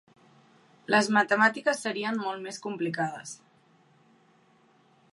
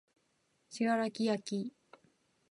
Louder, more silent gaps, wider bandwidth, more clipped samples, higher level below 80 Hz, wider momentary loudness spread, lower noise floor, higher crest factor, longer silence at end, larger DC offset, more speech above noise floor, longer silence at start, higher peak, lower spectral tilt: first, -27 LUFS vs -35 LUFS; neither; about the same, 11.5 kHz vs 11.5 kHz; neither; about the same, -84 dBFS vs -86 dBFS; first, 19 LU vs 12 LU; second, -63 dBFS vs -76 dBFS; about the same, 22 dB vs 18 dB; first, 1.75 s vs 0.8 s; neither; second, 35 dB vs 43 dB; first, 0.9 s vs 0.7 s; first, -8 dBFS vs -20 dBFS; about the same, -4 dB/octave vs -5 dB/octave